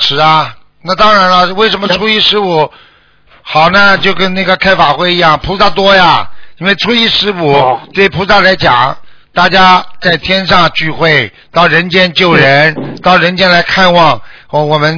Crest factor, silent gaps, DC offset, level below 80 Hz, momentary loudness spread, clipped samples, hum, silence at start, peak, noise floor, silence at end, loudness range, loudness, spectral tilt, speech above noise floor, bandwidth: 8 dB; none; under 0.1%; -36 dBFS; 8 LU; 2%; none; 0 s; 0 dBFS; -44 dBFS; 0 s; 2 LU; -7 LUFS; -5 dB/octave; 37 dB; 5.4 kHz